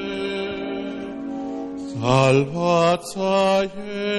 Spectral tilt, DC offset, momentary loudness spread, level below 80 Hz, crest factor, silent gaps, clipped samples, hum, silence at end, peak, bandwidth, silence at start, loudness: -6 dB/octave; under 0.1%; 13 LU; -54 dBFS; 16 dB; none; under 0.1%; none; 0 s; -6 dBFS; 12.5 kHz; 0 s; -22 LUFS